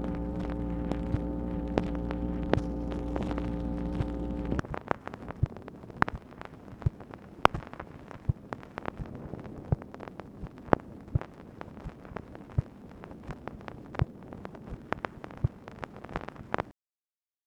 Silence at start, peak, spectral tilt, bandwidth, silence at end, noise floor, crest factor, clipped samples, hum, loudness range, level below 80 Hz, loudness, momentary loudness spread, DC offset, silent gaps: 0 s; 0 dBFS; -8 dB/octave; 11.5 kHz; 0.75 s; under -90 dBFS; 34 dB; under 0.1%; none; 6 LU; -42 dBFS; -35 LUFS; 15 LU; under 0.1%; none